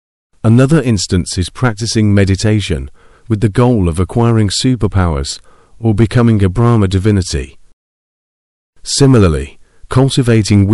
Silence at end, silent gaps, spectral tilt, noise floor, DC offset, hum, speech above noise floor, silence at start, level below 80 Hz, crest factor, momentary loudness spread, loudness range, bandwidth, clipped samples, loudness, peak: 0 s; 7.73-8.73 s; -6 dB/octave; under -90 dBFS; 0.3%; none; over 79 dB; 0.45 s; -30 dBFS; 12 dB; 10 LU; 2 LU; 12 kHz; under 0.1%; -12 LUFS; 0 dBFS